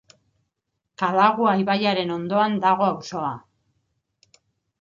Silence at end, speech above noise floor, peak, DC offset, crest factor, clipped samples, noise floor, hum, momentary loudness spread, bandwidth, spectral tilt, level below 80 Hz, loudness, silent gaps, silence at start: 1.45 s; 58 dB; -4 dBFS; under 0.1%; 20 dB; under 0.1%; -79 dBFS; none; 11 LU; 7.4 kHz; -6 dB/octave; -68 dBFS; -21 LUFS; none; 1 s